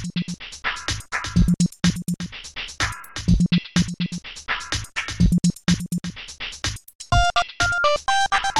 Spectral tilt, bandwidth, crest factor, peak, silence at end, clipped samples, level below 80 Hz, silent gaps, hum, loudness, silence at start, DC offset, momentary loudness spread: -4.5 dB/octave; 14.5 kHz; 16 dB; -6 dBFS; 0 s; under 0.1%; -32 dBFS; 6.95-6.99 s; none; -23 LUFS; 0 s; under 0.1%; 12 LU